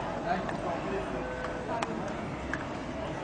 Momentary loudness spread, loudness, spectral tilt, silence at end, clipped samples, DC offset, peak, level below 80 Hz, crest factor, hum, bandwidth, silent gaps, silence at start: 4 LU; -34 LUFS; -6 dB/octave; 0 s; under 0.1%; under 0.1%; -12 dBFS; -50 dBFS; 22 dB; none; 10 kHz; none; 0 s